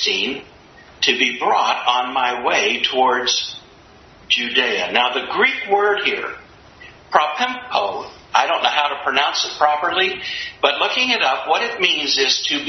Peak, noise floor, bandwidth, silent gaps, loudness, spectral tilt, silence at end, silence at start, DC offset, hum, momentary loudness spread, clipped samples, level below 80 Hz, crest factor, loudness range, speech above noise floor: 0 dBFS; -46 dBFS; 6.4 kHz; none; -17 LUFS; -1 dB/octave; 0 s; 0 s; under 0.1%; none; 6 LU; under 0.1%; -58 dBFS; 20 dB; 2 LU; 27 dB